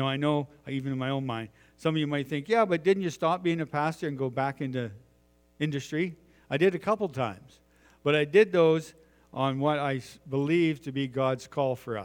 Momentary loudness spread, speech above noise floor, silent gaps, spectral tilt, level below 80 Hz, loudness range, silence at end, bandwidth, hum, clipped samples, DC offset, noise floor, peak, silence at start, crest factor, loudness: 11 LU; 36 dB; none; -6.5 dB/octave; -66 dBFS; 5 LU; 0 s; 17 kHz; none; under 0.1%; under 0.1%; -64 dBFS; -8 dBFS; 0 s; 20 dB; -28 LUFS